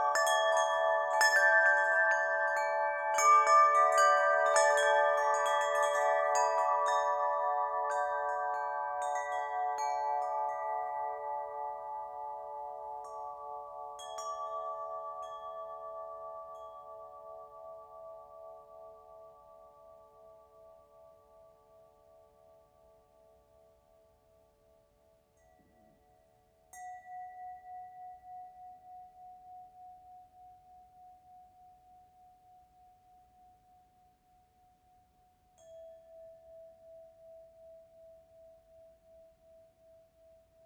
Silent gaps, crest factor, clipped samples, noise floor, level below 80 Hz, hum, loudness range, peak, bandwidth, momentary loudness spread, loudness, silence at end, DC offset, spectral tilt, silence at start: none; 20 dB; under 0.1%; -68 dBFS; -76 dBFS; none; 26 LU; -14 dBFS; 19 kHz; 26 LU; -30 LUFS; 2.55 s; under 0.1%; 1 dB/octave; 0 s